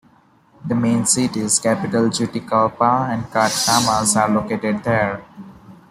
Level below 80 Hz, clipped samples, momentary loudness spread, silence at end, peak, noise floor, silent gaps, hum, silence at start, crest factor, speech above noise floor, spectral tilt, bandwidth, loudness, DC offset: -52 dBFS; under 0.1%; 7 LU; 0.15 s; -2 dBFS; -54 dBFS; none; none; 0.65 s; 18 dB; 35 dB; -3.5 dB/octave; 16 kHz; -18 LUFS; under 0.1%